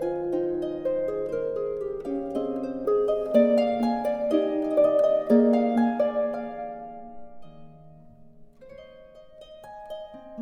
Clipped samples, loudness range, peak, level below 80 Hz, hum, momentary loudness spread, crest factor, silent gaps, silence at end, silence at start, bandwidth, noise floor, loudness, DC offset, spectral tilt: under 0.1%; 15 LU; -8 dBFS; -58 dBFS; none; 19 LU; 18 dB; none; 0 s; 0 s; 10.5 kHz; -49 dBFS; -25 LUFS; under 0.1%; -7.5 dB/octave